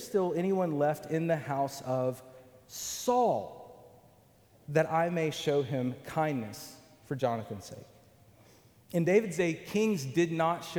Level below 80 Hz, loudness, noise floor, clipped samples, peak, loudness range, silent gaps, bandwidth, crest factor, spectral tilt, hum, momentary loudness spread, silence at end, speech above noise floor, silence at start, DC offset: -70 dBFS; -31 LUFS; -62 dBFS; under 0.1%; -12 dBFS; 3 LU; none; over 20 kHz; 20 dB; -5.5 dB/octave; none; 16 LU; 0 s; 31 dB; 0 s; under 0.1%